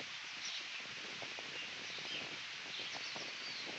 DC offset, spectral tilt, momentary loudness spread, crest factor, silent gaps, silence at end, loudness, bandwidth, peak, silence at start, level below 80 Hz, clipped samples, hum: under 0.1%; -0.5 dB/octave; 2 LU; 14 dB; none; 0 s; -43 LUFS; 8.4 kHz; -30 dBFS; 0 s; -86 dBFS; under 0.1%; none